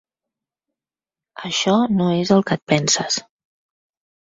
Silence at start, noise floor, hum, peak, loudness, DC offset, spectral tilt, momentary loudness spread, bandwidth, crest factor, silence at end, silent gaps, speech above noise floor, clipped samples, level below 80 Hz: 1.35 s; under -90 dBFS; none; -2 dBFS; -18 LUFS; under 0.1%; -4 dB/octave; 7 LU; 7.8 kHz; 20 dB; 1 s; 2.62-2.67 s; over 72 dB; under 0.1%; -58 dBFS